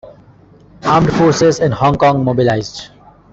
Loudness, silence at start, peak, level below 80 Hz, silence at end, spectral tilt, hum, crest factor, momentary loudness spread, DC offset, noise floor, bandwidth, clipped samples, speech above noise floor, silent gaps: -13 LUFS; 0.05 s; -2 dBFS; -40 dBFS; 0.45 s; -6 dB/octave; none; 14 dB; 11 LU; under 0.1%; -44 dBFS; 8 kHz; under 0.1%; 32 dB; none